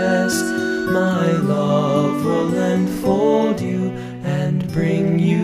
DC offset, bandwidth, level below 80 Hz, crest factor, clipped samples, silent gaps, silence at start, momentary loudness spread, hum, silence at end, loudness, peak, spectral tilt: under 0.1%; 15.5 kHz; -48 dBFS; 12 dB; under 0.1%; none; 0 s; 5 LU; none; 0 s; -19 LUFS; -4 dBFS; -6.5 dB/octave